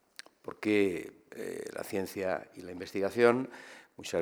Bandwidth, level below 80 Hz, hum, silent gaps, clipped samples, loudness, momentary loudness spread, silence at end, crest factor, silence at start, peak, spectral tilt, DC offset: over 20 kHz; -74 dBFS; none; none; under 0.1%; -32 LUFS; 20 LU; 0 s; 24 dB; 0.45 s; -8 dBFS; -5 dB/octave; under 0.1%